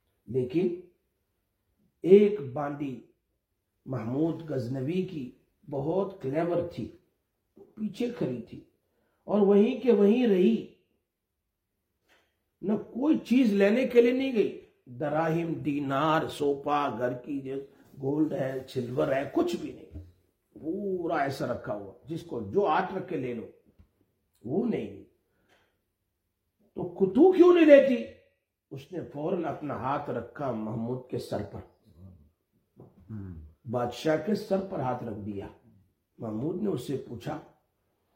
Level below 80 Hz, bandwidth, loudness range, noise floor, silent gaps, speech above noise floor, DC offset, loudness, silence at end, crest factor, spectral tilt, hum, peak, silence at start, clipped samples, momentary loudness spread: -66 dBFS; 16 kHz; 12 LU; -83 dBFS; none; 56 dB; under 0.1%; -28 LUFS; 0.75 s; 24 dB; -7.5 dB/octave; none; -4 dBFS; 0.3 s; under 0.1%; 19 LU